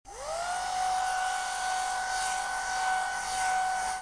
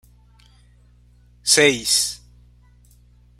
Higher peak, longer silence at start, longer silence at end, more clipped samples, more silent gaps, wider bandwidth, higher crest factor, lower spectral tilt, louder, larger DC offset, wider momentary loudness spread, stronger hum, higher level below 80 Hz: second, -18 dBFS vs -2 dBFS; second, 0.05 s vs 1.45 s; second, 0 s vs 1.25 s; neither; neither; second, 11 kHz vs 16 kHz; second, 12 dB vs 24 dB; second, 0.5 dB/octave vs -1 dB/octave; second, -30 LUFS vs -17 LUFS; neither; second, 3 LU vs 13 LU; second, none vs 60 Hz at -50 dBFS; about the same, -56 dBFS vs -52 dBFS